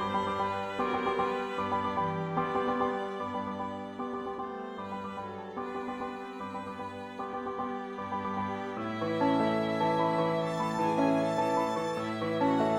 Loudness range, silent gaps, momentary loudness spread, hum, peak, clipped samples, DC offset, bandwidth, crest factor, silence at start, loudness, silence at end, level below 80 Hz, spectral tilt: 9 LU; none; 11 LU; none; -16 dBFS; under 0.1%; under 0.1%; 13 kHz; 16 dB; 0 s; -32 LUFS; 0 s; -64 dBFS; -6.5 dB/octave